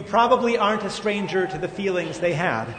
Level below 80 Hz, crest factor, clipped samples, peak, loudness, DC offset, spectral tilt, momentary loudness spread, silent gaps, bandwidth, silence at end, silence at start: -54 dBFS; 18 dB; under 0.1%; -4 dBFS; -22 LUFS; under 0.1%; -5 dB/octave; 6 LU; none; 9.6 kHz; 0 s; 0 s